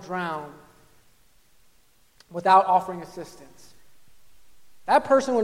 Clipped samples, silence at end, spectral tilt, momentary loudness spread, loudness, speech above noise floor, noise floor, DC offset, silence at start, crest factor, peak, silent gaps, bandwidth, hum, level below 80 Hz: under 0.1%; 0 s; -5 dB/octave; 22 LU; -22 LUFS; 40 dB; -63 dBFS; under 0.1%; 0 s; 22 dB; -4 dBFS; none; 16 kHz; none; -64 dBFS